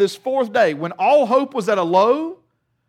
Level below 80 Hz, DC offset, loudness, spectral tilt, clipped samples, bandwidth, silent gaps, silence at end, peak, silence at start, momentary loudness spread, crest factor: -74 dBFS; under 0.1%; -18 LUFS; -5.5 dB/octave; under 0.1%; 14 kHz; none; 0.55 s; -4 dBFS; 0 s; 6 LU; 14 dB